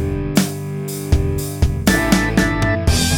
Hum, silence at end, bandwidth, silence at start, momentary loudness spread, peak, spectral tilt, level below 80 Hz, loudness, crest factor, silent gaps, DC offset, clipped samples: none; 0 s; 19 kHz; 0 s; 8 LU; -2 dBFS; -5 dB/octave; -24 dBFS; -18 LUFS; 14 dB; none; under 0.1%; under 0.1%